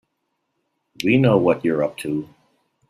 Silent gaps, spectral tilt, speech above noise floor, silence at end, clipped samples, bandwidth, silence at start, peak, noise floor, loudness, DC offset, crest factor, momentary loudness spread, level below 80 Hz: none; -7 dB/octave; 56 dB; 0.65 s; under 0.1%; 14.5 kHz; 1 s; -4 dBFS; -74 dBFS; -20 LUFS; under 0.1%; 18 dB; 11 LU; -58 dBFS